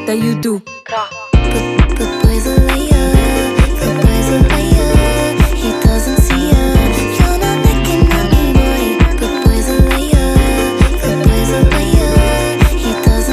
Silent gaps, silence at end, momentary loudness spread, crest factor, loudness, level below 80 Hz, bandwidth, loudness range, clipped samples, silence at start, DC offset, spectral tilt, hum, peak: none; 0 s; 3 LU; 10 dB; -12 LUFS; -14 dBFS; 15.5 kHz; 1 LU; under 0.1%; 0 s; under 0.1%; -5.5 dB/octave; none; 0 dBFS